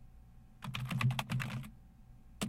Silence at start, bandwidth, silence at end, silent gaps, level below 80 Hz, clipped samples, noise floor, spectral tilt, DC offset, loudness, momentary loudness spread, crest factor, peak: 0 s; 16.5 kHz; 0 s; none; -58 dBFS; under 0.1%; -57 dBFS; -5 dB/octave; under 0.1%; -38 LUFS; 14 LU; 22 dB; -18 dBFS